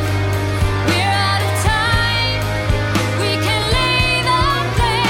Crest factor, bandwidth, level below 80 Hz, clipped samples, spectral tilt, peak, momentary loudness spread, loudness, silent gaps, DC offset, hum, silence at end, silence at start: 14 dB; 16.5 kHz; -26 dBFS; under 0.1%; -4.5 dB/octave; -2 dBFS; 4 LU; -16 LUFS; none; under 0.1%; none; 0 s; 0 s